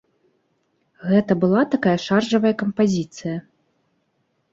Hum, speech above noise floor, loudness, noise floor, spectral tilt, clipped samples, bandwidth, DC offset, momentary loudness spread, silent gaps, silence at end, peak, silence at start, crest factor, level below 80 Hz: none; 50 dB; -20 LUFS; -69 dBFS; -6.5 dB/octave; under 0.1%; 7.8 kHz; under 0.1%; 12 LU; none; 1.15 s; -4 dBFS; 1 s; 18 dB; -60 dBFS